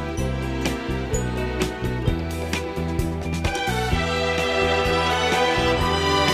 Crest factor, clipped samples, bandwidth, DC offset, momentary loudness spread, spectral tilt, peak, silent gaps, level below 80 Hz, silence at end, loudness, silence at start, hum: 16 dB; under 0.1%; 15.5 kHz; under 0.1%; 7 LU; -4.5 dB/octave; -6 dBFS; none; -32 dBFS; 0 s; -23 LUFS; 0 s; none